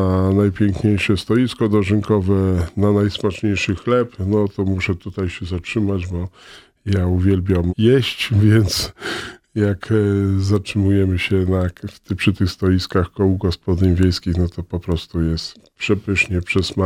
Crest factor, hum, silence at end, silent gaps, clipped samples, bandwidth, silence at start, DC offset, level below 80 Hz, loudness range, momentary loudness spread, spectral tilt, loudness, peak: 16 dB; none; 0 s; none; under 0.1%; 15 kHz; 0 s; under 0.1%; -38 dBFS; 3 LU; 9 LU; -6.5 dB/octave; -19 LUFS; -2 dBFS